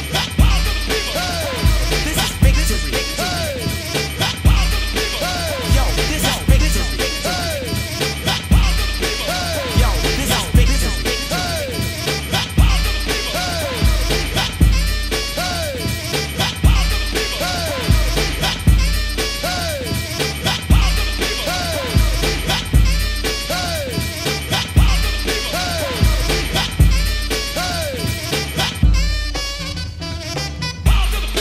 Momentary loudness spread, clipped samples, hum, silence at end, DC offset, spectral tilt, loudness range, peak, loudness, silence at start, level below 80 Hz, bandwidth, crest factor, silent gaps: 5 LU; under 0.1%; none; 0 s; under 0.1%; -4 dB/octave; 1 LU; 0 dBFS; -18 LUFS; 0 s; -20 dBFS; 16 kHz; 18 dB; none